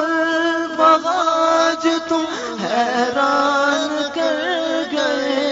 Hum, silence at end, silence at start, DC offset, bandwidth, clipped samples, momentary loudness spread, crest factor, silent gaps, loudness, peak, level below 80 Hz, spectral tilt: none; 0 s; 0 s; under 0.1%; 7.8 kHz; under 0.1%; 6 LU; 18 dB; none; -18 LUFS; 0 dBFS; -62 dBFS; -3 dB/octave